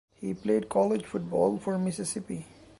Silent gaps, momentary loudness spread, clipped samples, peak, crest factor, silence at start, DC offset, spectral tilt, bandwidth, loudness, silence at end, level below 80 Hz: none; 10 LU; under 0.1%; -12 dBFS; 18 dB; 0.2 s; under 0.1%; -6 dB/octave; 11.5 kHz; -29 LUFS; 0.35 s; -62 dBFS